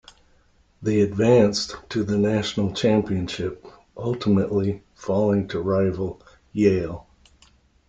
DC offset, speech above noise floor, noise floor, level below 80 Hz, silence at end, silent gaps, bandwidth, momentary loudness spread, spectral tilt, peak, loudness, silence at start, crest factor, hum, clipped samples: under 0.1%; 37 dB; -59 dBFS; -52 dBFS; 0.85 s; none; 7.8 kHz; 13 LU; -6.5 dB/octave; -4 dBFS; -23 LUFS; 0.8 s; 18 dB; none; under 0.1%